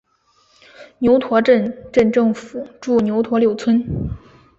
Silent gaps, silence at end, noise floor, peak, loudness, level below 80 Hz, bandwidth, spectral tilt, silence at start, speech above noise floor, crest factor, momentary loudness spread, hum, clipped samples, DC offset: none; 0.4 s; -59 dBFS; -2 dBFS; -17 LUFS; -42 dBFS; 7.8 kHz; -7.5 dB/octave; 0.8 s; 42 dB; 16 dB; 13 LU; none; under 0.1%; under 0.1%